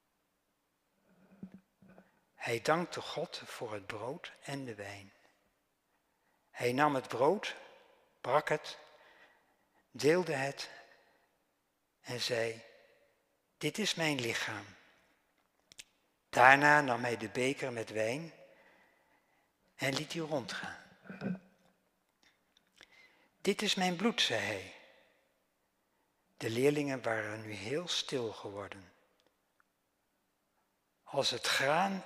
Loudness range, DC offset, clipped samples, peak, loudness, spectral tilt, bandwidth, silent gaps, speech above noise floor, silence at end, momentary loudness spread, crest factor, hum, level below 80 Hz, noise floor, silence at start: 11 LU; under 0.1%; under 0.1%; -6 dBFS; -33 LUFS; -3.5 dB/octave; 15.5 kHz; none; 47 dB; 0 s; 19 LU; 30 dB; none; -78 dBFS; -80 dBFS; 1.4 s